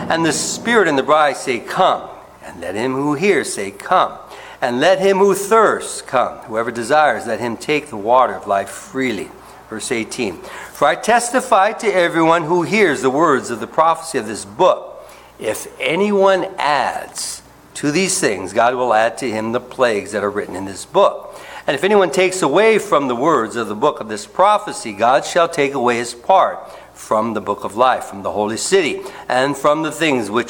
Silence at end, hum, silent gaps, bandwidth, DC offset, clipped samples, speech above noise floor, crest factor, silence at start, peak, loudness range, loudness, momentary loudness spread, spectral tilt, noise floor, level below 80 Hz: 0 s; none; none; 18 kHz; under 0.1%; under 0.1%; 22 dB; 16 dB; 0 s; 0 dBFS; 3 LU; -17 LUFS; 12 LU; -3.5 dB/octave; -38 dBFS; -56 dBFS